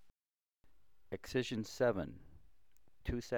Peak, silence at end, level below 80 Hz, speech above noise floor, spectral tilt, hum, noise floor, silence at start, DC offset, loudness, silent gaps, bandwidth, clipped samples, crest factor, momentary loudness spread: -22 dBFS; 0 s; -56 dBFS; over 52 dB; -5.5 dB/octave; none; under -90 dBFS; 0.1 s; 0.1%; -39 LUFS; none; over 20 kHz; under 0.1%; 20 dB; 14 LU